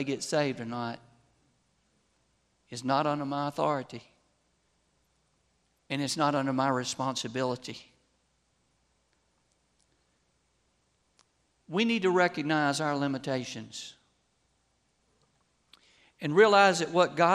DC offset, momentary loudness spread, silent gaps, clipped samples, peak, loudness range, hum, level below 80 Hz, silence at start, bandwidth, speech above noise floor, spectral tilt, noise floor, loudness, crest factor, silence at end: under 0.1%; 18 LU; none; under 0.1%; -8 dBFS; 9 LU; none; -76 dBFS; 0 s; 13 kHz; 45 dB; -4.5 dB/octave; -73 dBFS; -28 LUFS; 24 dB; 0 s